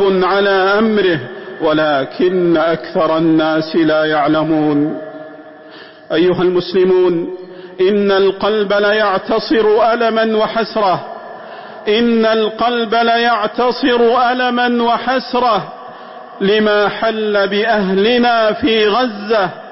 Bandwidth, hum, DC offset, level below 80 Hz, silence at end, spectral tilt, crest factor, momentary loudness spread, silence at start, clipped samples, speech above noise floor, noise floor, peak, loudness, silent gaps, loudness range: 5.8 kHz; none; 0.1%; -50 dBFS; 0 s; -8.5 dB/octave; 10 dB; 9 LU; 0 s; under 0.1%; 23 dB; -36 dBFS; -4 dBFS; -14 LUFS; none; 2 LU